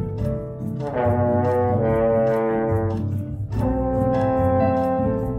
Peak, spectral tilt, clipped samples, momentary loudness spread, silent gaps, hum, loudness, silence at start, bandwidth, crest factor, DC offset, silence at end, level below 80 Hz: -8 dBFS; -10 dB/octave; under 0.1%; 8 LU; none; none; -22 LUFS; 0 s; 6.4 kHz; 12 dB; under 0.1%; 0 s; -36 dBFS